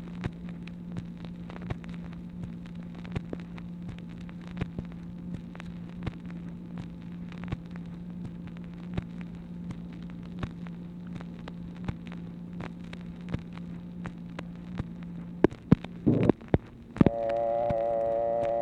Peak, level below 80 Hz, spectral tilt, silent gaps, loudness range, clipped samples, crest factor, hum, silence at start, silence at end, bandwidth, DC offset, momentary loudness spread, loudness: -6 dBFS; -50 dBFS; -9 dB/octave; none; 12 LU; under 0.1%; 26 dB; none; 0 s; 0 s; 8.4 kHz; under 0.1%; 15 LU; -34 LUFS